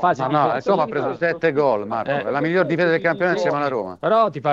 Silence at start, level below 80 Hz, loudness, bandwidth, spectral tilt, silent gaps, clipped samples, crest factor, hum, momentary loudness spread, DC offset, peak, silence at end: 0 s; -62 dBFS; -20 LUFS; 7.6 kHz; -7 dB/octave; none; under 0.1%; 14 dB; none; 5 LU; under 0.1%; -4 dBFS; 0 s